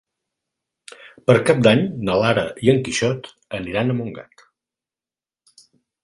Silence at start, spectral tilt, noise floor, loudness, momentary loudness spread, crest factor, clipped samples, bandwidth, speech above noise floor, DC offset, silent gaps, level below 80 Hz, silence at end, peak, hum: 1.05 s; -5.5 dB/octave; under -90 dBFS; -19 LUFS; 15 LU; 20 dB; under 0.1%; 11.5 kHz; over 71 dB; under 0.1%; none; -52 dBFS; 1.8 s; 0 dBFS; none